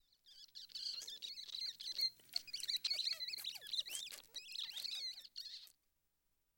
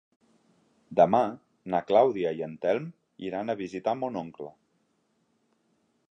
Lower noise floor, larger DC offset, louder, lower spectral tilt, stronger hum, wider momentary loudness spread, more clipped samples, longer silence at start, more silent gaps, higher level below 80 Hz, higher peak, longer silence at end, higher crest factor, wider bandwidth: first, -83 dBFS vs -72 dBFS; neither; second, -43 LUFS vs -27 LUFS; second, 3 dB/octave vs -7.5 dB/octave; neither; second, 14 LU vs 19 LU; neither; second, 0.25 s vs 0.9 s; neither; second, -86 dBFS vs -70 dBFS; second, -24 dBFS vs -6 dBFS; second, 0.9 s vs 1.6 s; about the same, 24 dB vs 22 dB; first, over 20 kHz vs 7.6 kHz